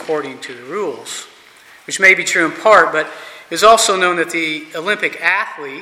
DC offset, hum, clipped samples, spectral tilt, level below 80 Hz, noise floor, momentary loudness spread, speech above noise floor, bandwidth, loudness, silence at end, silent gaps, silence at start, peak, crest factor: under 0.1%; none; under 0.1%; -1.5 dB/octave; -58 dBFS; -44 dBFS; 17 LU; 28 dB; 16 kHz; -14 LUFS; 0 s; none; 0 s; 0 dBFS; 16 dB